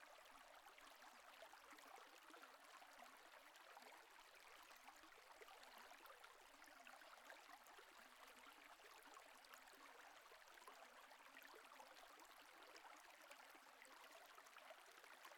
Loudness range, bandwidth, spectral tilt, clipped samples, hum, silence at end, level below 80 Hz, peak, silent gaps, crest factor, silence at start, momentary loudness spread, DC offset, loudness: 0 LU; 18 kHz; 0 dB/octave; under 0.1%; none; 0 s; under -90 dBFS; -42 dBFS; none; 22 dB; 0 s; 2 LU; under 0.1%; -64 LUFS